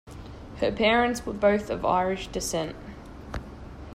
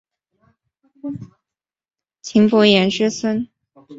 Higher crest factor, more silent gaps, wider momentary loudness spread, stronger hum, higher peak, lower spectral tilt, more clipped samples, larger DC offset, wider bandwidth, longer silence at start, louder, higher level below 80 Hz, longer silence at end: about the same, 18 dB vs 18 dB; neither; about the same, 21 LU vs 21 LU; neither; second, -10 dBFS vs -2 dBFS; about the same, -4.5 dB/octave vs -5 dB/octave; neither; neither; first, 16 kHz vs 7.8 kHz; second, 0.05 s vs 1.05 s; second, -26 LUFS vs -16 LUFS; first, -44 dBFS vs -60 dBFS; about the same, 0 s vs 0 s